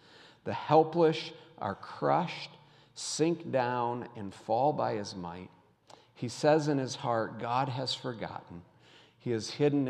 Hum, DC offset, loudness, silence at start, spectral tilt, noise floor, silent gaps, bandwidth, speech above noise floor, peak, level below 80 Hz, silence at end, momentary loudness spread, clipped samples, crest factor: none; under 0.1%; -31 LUFS; 0.2 s; -5.5 dB/octave; -60 dBFS; none; 11.5 kHz; 29 dB; -10 dBFS; -76 dBFS; 0 s; 16 LU; under 0.1%; 22 dB